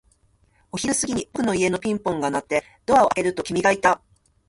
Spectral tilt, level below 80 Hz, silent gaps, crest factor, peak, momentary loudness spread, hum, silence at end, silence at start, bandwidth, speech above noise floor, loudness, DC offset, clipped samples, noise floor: -4 dB/octave; -54 dBFS; none; 18 dB; -4 dBFS; 8 LU; none; 0.5 s; 0.75 s; 11.5 kHz; 40 dB; -22 LUFS; under 0.1%; under 0.1%; -61 dBFS